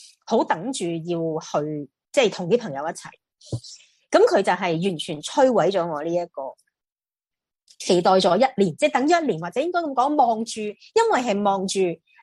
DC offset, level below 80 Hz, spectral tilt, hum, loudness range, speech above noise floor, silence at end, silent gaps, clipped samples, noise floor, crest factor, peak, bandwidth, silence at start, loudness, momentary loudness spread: under 0.1%; -66 dBFS; -5 dB/octave; none; 5 LU; over 68 dB; 0.25 s; none; under 0.1%; under -90 dBFS; 18 dB; -4 dBFS; 12 kHz; 0.3 s; -22 LUFS; 14 LU